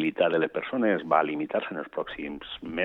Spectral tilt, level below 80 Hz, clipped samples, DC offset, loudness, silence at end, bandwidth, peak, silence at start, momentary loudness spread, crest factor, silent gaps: -8 dB/octave; -62 dBFS; under 0.1%; under 0.1%; -28 LUFS; 0 s; 4.3 kHz; -8 dBFS; 0 s; 11 LU; 20 dB; none